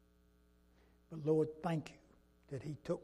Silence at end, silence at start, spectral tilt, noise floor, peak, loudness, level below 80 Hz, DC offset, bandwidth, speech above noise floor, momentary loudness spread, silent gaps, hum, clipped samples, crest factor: 0 s; 1.1 s; -8 dB/octave; -70 dBFS; -22 dBFS; -40 LUFS; -70 dBFS; under 0.1%; 12 kHz; 31 dB; 16 LU; none; none; under 0.1%; 20 dB